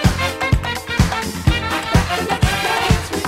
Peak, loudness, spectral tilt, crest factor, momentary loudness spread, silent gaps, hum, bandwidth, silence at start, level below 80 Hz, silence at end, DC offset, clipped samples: 0 dBFS; -18 LUFS; -4.5 dB/octave; 18 dB; 3 LU; none; none; 16 kHz; 0 s; -24 dBFS; 0 s; under 0.1%; under 0.1%